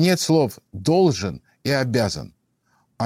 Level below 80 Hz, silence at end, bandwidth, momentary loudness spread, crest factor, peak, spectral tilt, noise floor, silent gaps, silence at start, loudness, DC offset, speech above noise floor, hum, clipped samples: -52 dBFS; 0 s; 16.5 kHz; 12 LU; 14 dB; -6 dBFS; -5.5 dB/octave; -66 dBFS; none; 0 s; -21 LUFS; under 0.1%; 46 dB; none; under 0.1%